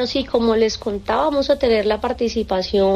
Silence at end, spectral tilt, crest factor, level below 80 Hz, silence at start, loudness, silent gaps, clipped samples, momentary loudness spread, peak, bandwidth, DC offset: 0 s; -5 dB/octave; 12 dB; -40 dBFS; 0 s; -19 LUFS; none; under 0.1%; 5 LU; -6 dBFS; 11 kHz; under 0.1%